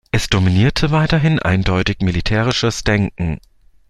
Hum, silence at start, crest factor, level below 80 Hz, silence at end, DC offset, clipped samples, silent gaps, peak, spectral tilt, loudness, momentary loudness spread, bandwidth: none; 0.15 s; 14 dB; -30 dBFS; 0.55 s; under 0.1%; under 0.1%; none; -2 dBFS; -5.5 dB/octave; -16 LUFS; 6 LU; 13 kHz